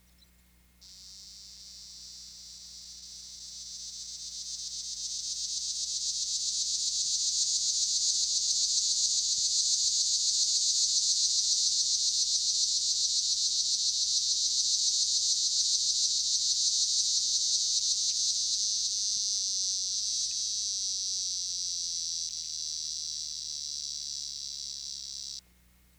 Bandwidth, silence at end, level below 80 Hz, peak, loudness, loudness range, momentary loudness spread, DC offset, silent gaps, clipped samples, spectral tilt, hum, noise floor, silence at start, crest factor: over 20 kHz; 0.6 s; -64 dBFS; -14 dBFS; -27 LUFS; 13 LU; 18 LU; under 0.1%; none; under 0.1%; 4 dB/octave; 60 Hz at -70 dBFS; -62 dBFS; 0.8 s; 18 dB